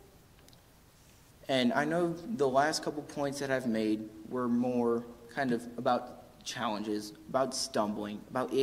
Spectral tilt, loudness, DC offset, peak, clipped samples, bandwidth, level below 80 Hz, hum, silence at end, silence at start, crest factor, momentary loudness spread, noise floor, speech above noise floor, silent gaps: -4.5 dB/octave; -33 LUFS; under 0.1%; -12 dBFS; under 0.1%; 16 kHz; -66 dBFS; none; 0 s; 1.45 s; 20 dB; 10 LU; -60 dBFS; 28 dB; none